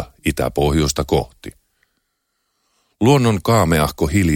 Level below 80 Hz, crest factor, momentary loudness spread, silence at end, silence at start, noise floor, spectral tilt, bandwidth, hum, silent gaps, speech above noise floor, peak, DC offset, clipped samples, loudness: -32 dBFS; 18 dB; 11 LU; 0 s; 0 s; -72 dBFS; -5.5 dB/octave; 17 kHz; none; none; 55 dB; -2 dBFS; under 0.1%; under 0.1%; -17 LUFS